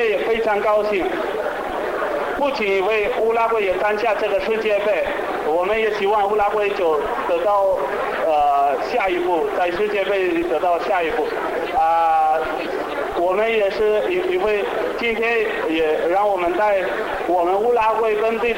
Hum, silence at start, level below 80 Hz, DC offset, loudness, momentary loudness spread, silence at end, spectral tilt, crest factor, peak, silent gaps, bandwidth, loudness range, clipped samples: none; 0 s; -48 dBFS; under 0.1%; -19 LUFS; 5 LU; 0 s; -4.5 dB/octave; 10 dB; -10 dBFS; none; 16.5 kHz; 1 LU; under 0.1%